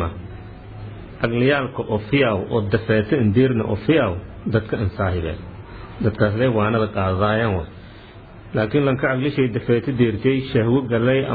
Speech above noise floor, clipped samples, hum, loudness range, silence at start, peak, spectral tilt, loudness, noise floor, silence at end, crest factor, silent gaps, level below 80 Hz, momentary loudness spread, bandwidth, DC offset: 21 dB; under 0.1%; none; 2 LU; 0 s; -4 dBFS; -11 dB/octave; -20 LUFS; -41 dBFS; 0 s; 16 dB; none; -42 dBFS; 18 LU; 4.9 kHz; under 0.1%